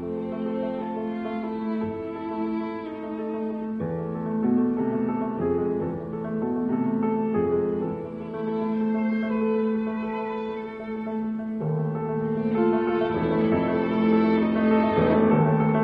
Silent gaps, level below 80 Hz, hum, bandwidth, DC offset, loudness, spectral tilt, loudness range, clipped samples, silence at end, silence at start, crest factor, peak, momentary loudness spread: none; -54 dBFS; none; 4.9 kHz; under 0.1%; -26 LUFS; -10.5 dB/octave; 7 LU; under 0.1%; 0 s; 0 s; 18 dB; -8 dBFS; 10 LU